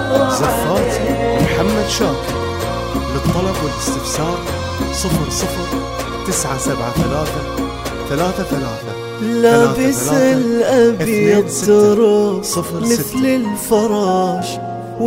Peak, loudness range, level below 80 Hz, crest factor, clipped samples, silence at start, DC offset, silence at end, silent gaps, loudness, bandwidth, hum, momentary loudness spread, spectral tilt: 0 dBFS; 6 LU; -32 dBFS; 16 dB; under 0.1%; 0 s; under 0.1%; 0 s; none; -16 LUFS; 16.5 kHz; none; 9 LU; -5 dB/octave